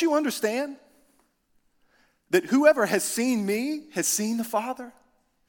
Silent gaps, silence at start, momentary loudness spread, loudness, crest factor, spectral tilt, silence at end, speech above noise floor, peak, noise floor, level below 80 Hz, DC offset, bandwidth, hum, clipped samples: none; 0 s; 13 LU; -25 LUFS; 22 dB; -3.5 dB/octave; 0.6 s; 43 dB; -4 dBFS; -68 dBFS; -74 dBFS; under 0.1%; 18 kHz; none; under 0.1%